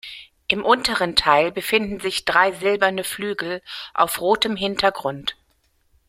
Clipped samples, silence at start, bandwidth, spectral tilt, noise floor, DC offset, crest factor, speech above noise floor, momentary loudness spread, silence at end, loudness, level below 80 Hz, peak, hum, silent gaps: under 0.1%; 0.05 s; 16.5 kHz; -3 dB/octave; -64 dBFS; under 0.1%; 20 dB; 43 dB; 11 LU; 0.75 s; -20 LUFS; -52 dBFS; -2 dBFS; none; none